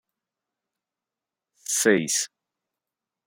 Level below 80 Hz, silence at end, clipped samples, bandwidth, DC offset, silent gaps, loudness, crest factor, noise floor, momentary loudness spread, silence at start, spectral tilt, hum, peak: -76 dBFS; 1 s; under 0.1%; 16.5 kHz; under 0.1%; none; -22 LUFS; 24 dB; -89 dBFS; 14 LU; 1.7 s; -2.5 dB/octave; none; -6 dBFS